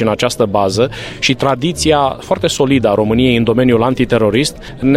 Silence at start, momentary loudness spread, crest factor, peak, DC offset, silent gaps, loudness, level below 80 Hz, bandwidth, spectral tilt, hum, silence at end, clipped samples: 0 s; 5 LU; 12 dB; 0 dBFS; under 0.1%; none; -13 LUFS; -36 dBFS; 15.5 kHz; -5 dB/octave; none; 0 s; under 0.1%